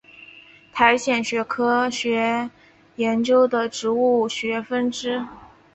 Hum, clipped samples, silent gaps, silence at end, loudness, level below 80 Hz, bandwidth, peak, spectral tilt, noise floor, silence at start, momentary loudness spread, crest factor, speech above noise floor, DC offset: none; under 0.1%; none; 0.3 s; -21 LUFS; -62 dBFS; 8.2 kHz; -2 dBFS; -3.5 dB/octave; -48 dBFS; 0.2 s; 9 LU; 20 dB; 27 dB; under 0.1%